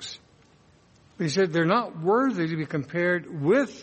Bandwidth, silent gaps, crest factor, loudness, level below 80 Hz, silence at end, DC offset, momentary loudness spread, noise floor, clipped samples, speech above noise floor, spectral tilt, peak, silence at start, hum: 8.4 kHz; none; 18 dB; -25 LUFS; -68 dBFS; 0 s; under 0.1%; 7 LU; -58 dBFS; under 0.1%; 34 dB; -6 dB/octave; -8 dBFS; 0 s; none